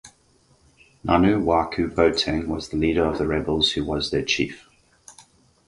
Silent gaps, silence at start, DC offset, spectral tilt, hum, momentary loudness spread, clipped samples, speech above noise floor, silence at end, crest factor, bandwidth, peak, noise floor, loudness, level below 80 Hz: none; 0.05 s; under 0.1%; -5 dB/octave; none; 7 LU; under 0.1%; 38 dB; 0.55 s; 20 dB; 11.5 kHz; -4 dBFS; -60 dBFS; -22 LUFS; -40 dBFS